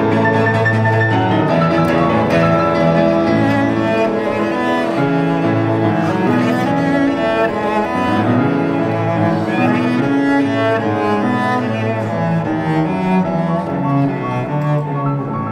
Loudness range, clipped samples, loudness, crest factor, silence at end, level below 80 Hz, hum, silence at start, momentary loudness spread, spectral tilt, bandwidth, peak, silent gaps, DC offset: 3 LU; under 0.1%; -15 LUFS; 14 dB; 0 s; -46 dBFS; none; 0 s; 4 LU; -8 dB/octave; 12.5 kHz; -2 dBFS; none; under 0.1%